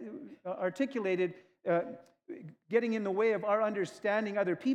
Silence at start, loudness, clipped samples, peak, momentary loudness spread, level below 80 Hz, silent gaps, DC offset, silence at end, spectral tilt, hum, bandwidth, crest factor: 0 s; -32 LUFS; under 0.1%; -16 dBFS; 17 LU; under -90 dBFS; none; under 0.1%; 0 s; -6.5 dB/octave; none; 10.5 kHz; 18 dB